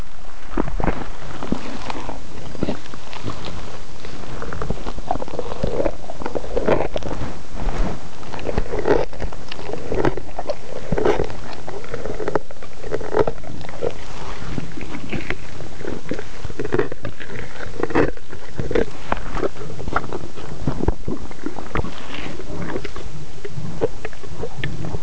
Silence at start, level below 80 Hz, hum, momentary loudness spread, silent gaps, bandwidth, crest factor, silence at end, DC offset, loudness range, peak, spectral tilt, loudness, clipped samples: 0 s; -34 dBFS; none; 13 LU; none; 8 kHz; 20 dB; 0 s; 20%; 6 LU; -2 dBFS; -6 dB/octave; -27 LUFS; under 0.1%